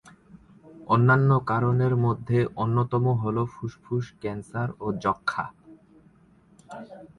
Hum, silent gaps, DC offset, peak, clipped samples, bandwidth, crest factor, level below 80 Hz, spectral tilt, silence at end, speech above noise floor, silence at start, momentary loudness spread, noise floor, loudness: none; none; under 0.1%; -8 dBFS; under 0.1%; 9.6 kHz; 18 dB; -56 dBFS; -9 dB/octave; 0.15 s; 33 dB; 0.35 s; 18 LU; -57 dBFS; -25 LUFS